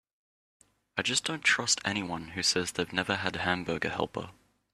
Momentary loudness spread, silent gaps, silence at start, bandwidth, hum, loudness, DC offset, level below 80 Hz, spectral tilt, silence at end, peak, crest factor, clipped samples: 10 LU; none; 0.95 s; 14 kHz; none; -29 LUFS; under 0.1%; -64 dBFS; -2 dB/octave; 0.45 s; -8 dBFS; 24 dB; under 0.1%